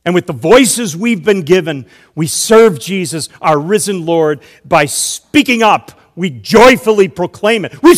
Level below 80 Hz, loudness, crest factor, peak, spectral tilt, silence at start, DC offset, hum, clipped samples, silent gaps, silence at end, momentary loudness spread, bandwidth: -44 dBFS; -11 LUFS; 10 dB; 0 dBFS; -4 dB/octave; 0.05 s; under 0.1%; none; 3%; none; 0 s; 13 LU; 16.5 kHz